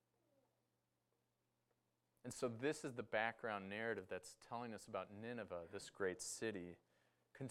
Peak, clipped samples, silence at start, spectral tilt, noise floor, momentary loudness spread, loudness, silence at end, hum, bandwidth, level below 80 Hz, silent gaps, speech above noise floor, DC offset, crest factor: -26 dBFS; under 0.1%; 2.25 s; -4 dB/octave; -87 dBFS; 11 LU; -47 LUFS; 0 s; none; 16 kHz; -86 dBFS; none; 40 dB; under 0.1%; 24 dB